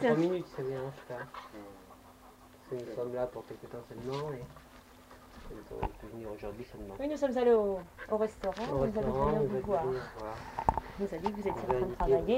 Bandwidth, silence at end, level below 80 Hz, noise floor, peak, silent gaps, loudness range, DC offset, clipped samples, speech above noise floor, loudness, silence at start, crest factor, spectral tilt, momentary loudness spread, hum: 16 kHz; 0 s; -50 dBFS; -56 dBFS; -10 dBFS; none; 11 LU; under 0.1%; under 0.1%; 23 dB; -34 LUFS; 0 s; 24 dB; -7 dB/octave; 20 LU; none